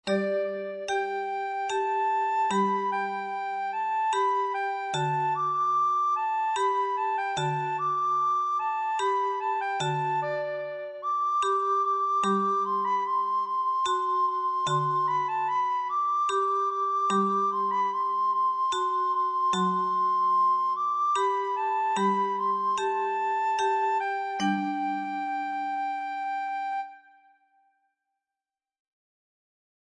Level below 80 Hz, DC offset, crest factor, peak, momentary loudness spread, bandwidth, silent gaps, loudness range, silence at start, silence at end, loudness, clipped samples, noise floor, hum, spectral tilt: -74 dBFS; under 0.1%; 12 dB; -14 dBFS; 6 LU; 10 kHz; none; 5 LU; 0.05 s; 2.85 s; -27 LUFS; under 0.1%; under -90 dBFS; none; -4.5 dB/octave